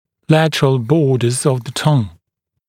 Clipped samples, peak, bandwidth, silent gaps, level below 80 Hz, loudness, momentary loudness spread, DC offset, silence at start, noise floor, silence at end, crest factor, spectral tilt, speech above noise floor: under 0.1%; 0 dBFS; 15 kHz; none; -52 dBFS; -15 LUFS; 4 LU; under 0.1%; 0.3 s; -75 dBFS; 0.6 s; 16 dB; -6 dB/octave; 60 dB